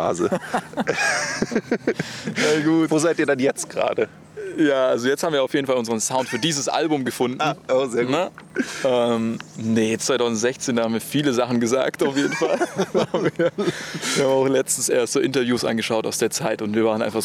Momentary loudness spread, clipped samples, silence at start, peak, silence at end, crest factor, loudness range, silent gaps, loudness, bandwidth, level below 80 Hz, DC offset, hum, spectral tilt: 6 LU; under 0.1%; 0 s; -6 dBFS; 0 s; 16 dB; 1 LU; none; -21 LUFS; 16.5 kHz; -62 dBFS; under 0.1%; none; -4 dB/octave